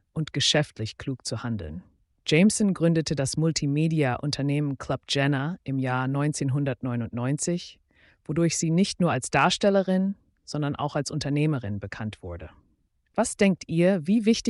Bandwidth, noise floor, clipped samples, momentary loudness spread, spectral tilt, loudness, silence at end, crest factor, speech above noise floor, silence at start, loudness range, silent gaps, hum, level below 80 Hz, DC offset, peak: 11.5 kHz; -68 dBFS; under 0.1%; 12 LU; -5 dB/octave; -25 LUFS; 0 s; 16 dB; 43 dB; 0.15 s; 4 LU; none; none; -54 dBFS; under 0.1%; -10 dBFS